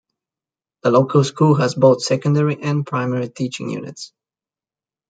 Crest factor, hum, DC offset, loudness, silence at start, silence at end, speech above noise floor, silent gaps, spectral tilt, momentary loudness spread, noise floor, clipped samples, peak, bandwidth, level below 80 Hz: 18 dB; none; under 0.1%; -18 LUFS; 0.85 s; 1 s; over 73 dB; none; -6.5 dB/octave; 14 LU; under -90 dBFS; under 0.1%; -2 dBFS; 9.2 kHz; -62 dBFS